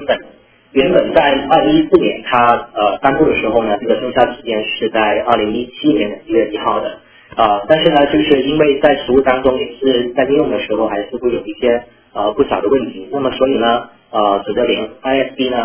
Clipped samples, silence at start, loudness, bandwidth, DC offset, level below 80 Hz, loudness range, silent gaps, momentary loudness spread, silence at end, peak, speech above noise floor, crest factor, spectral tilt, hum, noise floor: 0.1%; 0 s; -14 LUFS; 4 kHz; under 0.1%; -42 dBFS; 4 LU; none; 8 LU; 0 s; 0 dBFS; 30 dB; 14 dB; -9.5 dB/octave; none; -44 dBFS